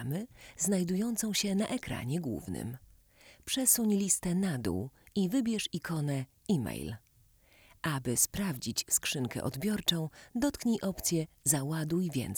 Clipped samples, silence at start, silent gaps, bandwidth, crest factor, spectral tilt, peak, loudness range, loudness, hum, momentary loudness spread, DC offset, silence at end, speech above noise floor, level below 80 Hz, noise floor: under 0.1%; 0 s; none; over 20 kHz; 22 dB; -4 dB/octave; -10 dBFS; 3 LU; -32 LUFS; none; 10 LU; under 0.1%; 0 s; 32 dB; -58 dBFS; -64 dBFS